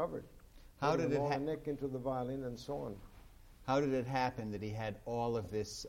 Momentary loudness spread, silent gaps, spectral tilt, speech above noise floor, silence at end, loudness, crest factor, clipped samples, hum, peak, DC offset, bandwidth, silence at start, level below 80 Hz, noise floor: 9 LU; none; -6 dB/octave; 20 dB; 0 s; -38 LUFS; 18 dB; under 0.1%; none; -20 dBFS; under 0.1%; 16.5 kHz; 0 s; -58 dBFS; -58 dBFS